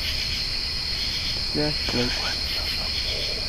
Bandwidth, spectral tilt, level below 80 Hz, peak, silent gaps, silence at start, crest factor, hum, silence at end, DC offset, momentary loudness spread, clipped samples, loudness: 15.5 kHz; -3 dB/octave; -36 dBFS; -10 dBFS; none; 0 s; 16 dB; none; 0 s; under 0.1%; 2 LU; under 0.1%; -24 LUFS